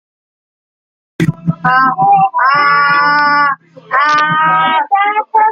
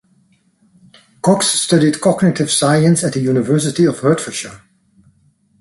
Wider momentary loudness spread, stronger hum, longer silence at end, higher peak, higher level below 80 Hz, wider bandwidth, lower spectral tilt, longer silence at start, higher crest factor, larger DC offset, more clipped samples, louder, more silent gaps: about the same, 7 LU vs 7 LU; neither; second, 0 s vs 1.05 s; about the same, -2 dBFS vs 0 dBFS; about the same, -52 dBFS vs -54 dBFS; about the same, 11.5 kHz vs 12 kHz; about the same, -5.5 dB/octave vs -5 dB/octave; about the same, 1.2 s vs 1.25 s; second, 10 dB vs 16 dB; neither; neither; first, -11 LUFS vs -14 LUFS; neither